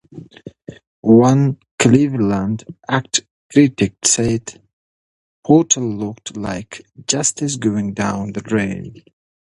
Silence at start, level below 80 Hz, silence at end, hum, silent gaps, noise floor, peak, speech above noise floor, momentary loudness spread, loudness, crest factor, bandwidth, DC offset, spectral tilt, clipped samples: 0.15 s; -48 dBFS; 0.55 s; none; 0.87-1.03 s, 1.71-1.78 s, 3.31-3.50 s, 4.73-5.43 s; -37 dBFS; 0 dBFS; 21 dB; 18 LU; -17 LUFS; 18 dB; 11.5 kHz; under 0.1%; -4.5 dB/octave; under 0.1%